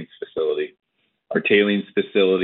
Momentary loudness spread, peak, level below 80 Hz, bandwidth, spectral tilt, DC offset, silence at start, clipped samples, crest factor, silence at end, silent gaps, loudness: 12 LU; -2 dBFS; -70 dBFS; 4.2 kHz; -3.5 dB/octave; under 0.1%; 0 s; under 0.1%; 18 dB; 0 s; none; -21 LUFS